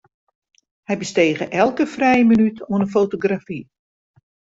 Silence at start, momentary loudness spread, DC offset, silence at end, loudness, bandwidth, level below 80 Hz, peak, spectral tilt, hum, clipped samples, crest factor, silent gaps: 0.9 s; 12 LU; under 0.1%; 0.95 s; -18 LUFS; 7.8 kHz; -56 dBFS; -4 dBFS; -6 dB/octave; none; under 0.1%; 16 dB; none